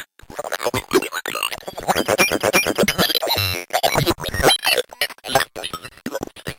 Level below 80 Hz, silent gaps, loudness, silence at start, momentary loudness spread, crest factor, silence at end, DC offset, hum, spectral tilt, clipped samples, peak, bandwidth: -42 dBFS; none; -19 LUFS; 0 s; 13 LU; 18 dB; 0.05 s; under 0.1%; none; -3 dB/octave; under 0.1%; -4 dBFS; 17 kHz